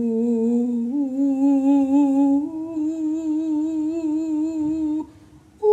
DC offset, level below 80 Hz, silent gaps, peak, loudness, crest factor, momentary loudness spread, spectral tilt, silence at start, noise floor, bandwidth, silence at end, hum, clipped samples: under 0.1%; -60 dBFS; none; -8 dBFS; -21 LUFS; 12 dB; 8 LU; -8 dB/octave; 0 s; -48 dBFS; 8.2 kHz; 0 s; none; under 0.1%